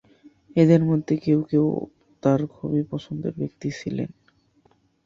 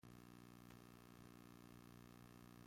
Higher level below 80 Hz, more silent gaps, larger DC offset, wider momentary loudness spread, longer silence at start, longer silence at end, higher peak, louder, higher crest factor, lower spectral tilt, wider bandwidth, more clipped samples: first, -60 dBFS vs -76 dBFS; neither; neither; first, 13 LU vs 1 LU; first, 0.25 s vs 0.05 s; first, 1 s vs 0 s; first, -4 dBFS vs -46 dBFS; first, -23 LUFS vs -63 LUFS; about the same, 20 dB vs 16 dB; first, -9 dB/octave vs -5.5 dB/octave; second, 7.4 kHz vs 16.5 kHz; neither